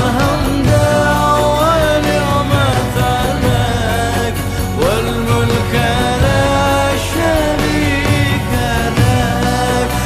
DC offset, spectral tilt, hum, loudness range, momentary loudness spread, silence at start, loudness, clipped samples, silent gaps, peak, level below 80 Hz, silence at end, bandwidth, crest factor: under 0.1%; -5.5 dB/octave; none; 2 LU; 3 LU; 0 s; -14 LUFS; under 0.1%; none; -2 dBFS; -24 dBFS; 0 s; 15 kHz; 12 dB